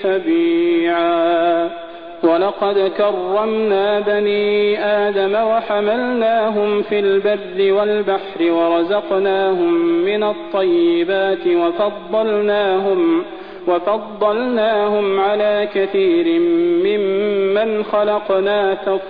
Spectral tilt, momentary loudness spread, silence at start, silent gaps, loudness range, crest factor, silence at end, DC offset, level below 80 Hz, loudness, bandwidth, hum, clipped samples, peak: -8.5 dB/octave; 4 LU; 0 s; none; 1 LU; 12 dB; 0 s; 0.5%; -56 dBFS; -16 LUFS; 4.9 kHz; none; under 0.1%; -4 dBFS